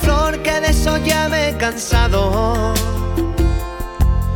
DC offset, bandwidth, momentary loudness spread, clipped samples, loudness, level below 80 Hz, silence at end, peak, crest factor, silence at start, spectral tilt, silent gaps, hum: under 0.1%; 18.5 kHz; 4 LU; under 0.1%; -17 LUFS; -20 dBFS; 0 s; -2 dBFS; 14 dB; 0 s; -5 dB/octave; none; none